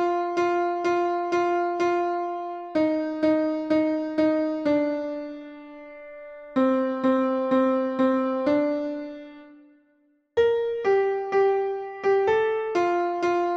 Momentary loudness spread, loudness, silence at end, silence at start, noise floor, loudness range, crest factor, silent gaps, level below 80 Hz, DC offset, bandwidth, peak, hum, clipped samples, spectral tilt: 14 LU; -24 LUFS; 0 s; 0 s; -65 dBFS; 2 LU; 14 dB; none; -64 dBFS; under 0.1%; 8 kHz; -10 dBFS; none; under 0.1%; -6 dB/octave